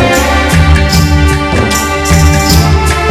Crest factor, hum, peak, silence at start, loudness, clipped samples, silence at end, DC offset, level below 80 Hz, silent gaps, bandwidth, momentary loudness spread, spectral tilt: 8 dB; none; 0 dBFS; 0 s; -8 LUFS; 1%; 0 s; under 0.1%; -12 dBFS; none; 14.5 kHz; 3 LU; -4.5 dB/octave